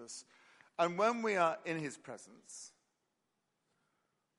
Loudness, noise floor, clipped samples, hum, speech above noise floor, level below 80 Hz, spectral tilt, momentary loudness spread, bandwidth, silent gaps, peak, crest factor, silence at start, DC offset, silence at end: -35 LUFS; -84 dBFS; under 0.1%; none; 47 dB; -90 dBFS; -4.5 dB/octave; 19 LU; 11.5 kHz; none; -18 dBFS; 22 dB; 0 s; under 0.1%; 1.7 s